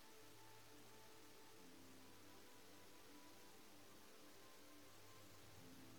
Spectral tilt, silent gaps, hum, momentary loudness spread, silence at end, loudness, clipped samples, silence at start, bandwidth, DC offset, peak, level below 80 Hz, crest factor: -3 dB/octave; none; none; 1 LU; 0 s; -64 LUFS; under 0.1%; 0 s; 19 kHz; under 0.1%; -50 dBFS; -86 dBFS; 16 dB